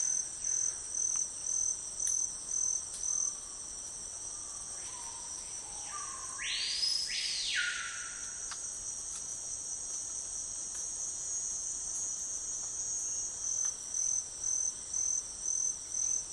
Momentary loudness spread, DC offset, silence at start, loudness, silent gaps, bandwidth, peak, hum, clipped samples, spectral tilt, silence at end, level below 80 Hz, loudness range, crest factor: 8 LU; under 0.1%; 0 s; -34 LUFS; none; 11.5 kHz; -16 dBFS; none; under 0.1%; 2 dB/octave; 0 s; -64 dBFS; 5 LU; 22 dB